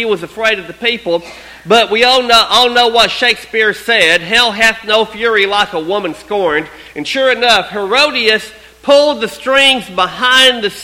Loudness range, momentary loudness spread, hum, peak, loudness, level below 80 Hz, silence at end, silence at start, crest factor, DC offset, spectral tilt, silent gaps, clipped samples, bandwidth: 4 LU; 10 LU; none; 0 dBFS; -11 LUFS; -46 dBFS; 0 s; 0 s; 12 dB; under 0.1%; -2 dB/octave; none; 0.3%; 17 kHz